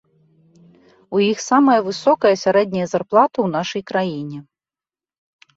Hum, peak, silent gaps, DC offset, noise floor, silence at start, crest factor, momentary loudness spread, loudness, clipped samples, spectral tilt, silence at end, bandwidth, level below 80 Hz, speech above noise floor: none; -2 dBFS; none; under 0.1%; under -90 dBFS; 1.1 s; 18 dB; 9 LU; -18 LUFS; under 0.1%; -5 dB/octave; 1.15 s; 8 kHz; -64 dBFS; over 73 dB